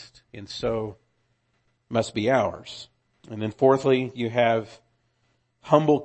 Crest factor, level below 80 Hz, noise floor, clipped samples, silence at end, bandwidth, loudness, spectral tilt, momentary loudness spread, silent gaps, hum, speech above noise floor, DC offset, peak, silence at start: 24 dB; -58 dBFS; -70 dBFS; under 0.1%; 0 s; 8.6 kHz; -24 LUFS; -6.5 dB/octave; 20 LU; none; none; 47 dB; under 0.1%; -2 dBFS; 0 s